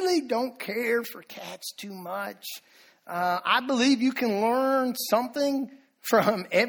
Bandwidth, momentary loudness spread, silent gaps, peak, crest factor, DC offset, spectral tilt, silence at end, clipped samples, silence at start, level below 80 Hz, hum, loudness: over 20 kHz; 15 LU; none; -8 dBFS; 18 dB; under 0.1%; -4 dB/octave; 0 s; under 0.1%; 0 s; -74 dBFS; none; -26 LUFS